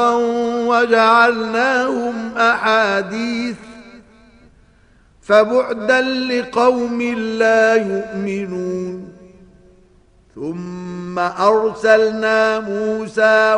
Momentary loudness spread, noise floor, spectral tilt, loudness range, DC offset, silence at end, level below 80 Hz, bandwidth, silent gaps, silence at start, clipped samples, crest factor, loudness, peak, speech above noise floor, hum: 13 LU; -51 dBFS; -5 dB/octave; 7 LU; under 0.1%; 0 s; -54 dBFS; 10.5 kHz; none; 0 s; under 0.1%; 18 dB; -16 LUFS; 0 dBFS; 35 dB; none